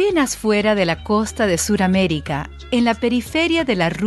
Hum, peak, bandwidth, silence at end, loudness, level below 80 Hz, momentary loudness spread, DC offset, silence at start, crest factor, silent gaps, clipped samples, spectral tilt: none; -2 dBFS; 12.5 kHz; 0 s; -18 LUFS; -40 dBFS; 5 LU; under 0.1%; 0 s; 16 dB; none; under 0.1%; -4.5 dB/octave